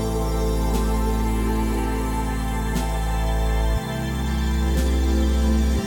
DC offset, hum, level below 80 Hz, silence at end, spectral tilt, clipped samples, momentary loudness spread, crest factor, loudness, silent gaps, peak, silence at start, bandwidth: under 0.1%; none; -22 dBFS; 0 s; -6 dB/octave; under 0.1%; 5 LU; 12 dB; -23 LUFS; none; -10 dBFS; 0 s; 18.5 kHz